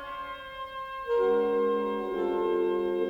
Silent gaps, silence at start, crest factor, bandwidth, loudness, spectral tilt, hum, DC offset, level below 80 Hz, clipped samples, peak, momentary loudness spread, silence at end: none; 0 s; 12 dB; 5.6 kHz; -29 LUFS; -7 dB/octave; none; under 0.1%; -60 dBFS; under 0.1%; -16 dBFS; 13 LU; 0 s